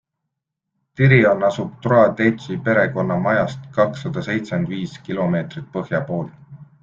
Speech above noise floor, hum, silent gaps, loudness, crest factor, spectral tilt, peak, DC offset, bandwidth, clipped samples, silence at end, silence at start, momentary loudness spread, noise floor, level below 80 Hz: 61 dB; none; none; -19 LUFS; 18 dB; -8 dB/octave; -2 dBFS; under 0.1%; 7.4 kHz; under 0.1%; 0.2 s; 1 s; 13 LU; -79 dBFS; -54 dBFS